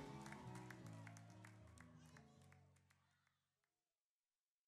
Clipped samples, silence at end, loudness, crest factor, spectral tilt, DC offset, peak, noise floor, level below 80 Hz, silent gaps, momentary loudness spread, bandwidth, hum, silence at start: under 0.1%; 1.5 s; -60 LUFS; 22 dB; -5.5 dB/octave; under 0.1%; -40 dBFS; under -90 dBFS; -80 dBFS; none; 11 LU; 13 kHz; none; 0 s